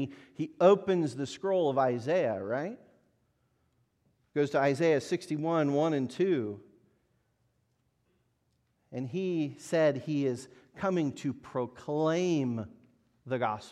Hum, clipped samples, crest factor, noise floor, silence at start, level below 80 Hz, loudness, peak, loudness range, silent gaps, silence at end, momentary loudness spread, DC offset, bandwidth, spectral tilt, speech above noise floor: none; under 0.1%; 20 dB; -75 dBFS; 0 s; -74 dBFS; -30 LUFS; -10 dBFS; 6 LU; none; 0 s; 13 LU; under 0.1%; 12.5 kHz; -6.5 dB/octave; 45 dB